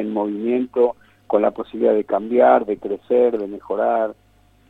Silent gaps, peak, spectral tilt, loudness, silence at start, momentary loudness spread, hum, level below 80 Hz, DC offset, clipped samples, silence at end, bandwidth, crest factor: none; -2 dBFS; -8.5 dB/octave; -19 LUFS; 0 s; 11 LU; none; -60 dBFS; under 0.1%; under 0.1%; 0.55 s; 4.1 kHz; 18 dB